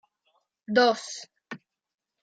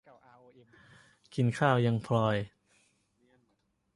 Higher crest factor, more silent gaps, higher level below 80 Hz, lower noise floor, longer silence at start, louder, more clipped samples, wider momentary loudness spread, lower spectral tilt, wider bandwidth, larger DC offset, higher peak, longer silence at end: about the same, 22 dB vs 22 dB; neither; second, -80 dBFS vs -66 dBFS; about the same, -73 dBFS vs -76 dBFS; second, 0.7 s vs 1.35 s; first, -24 LUFS vs -29 LUFS; neither; first, 22 LU vs 12 LU; second, -3 dB/octave vs -7.5 dB/octave; second, 9.2 kHz vs 11.5 kHz; neither; first, -8 dBFS vs -12 dBFS; second, 0.65 s vs 1.5 s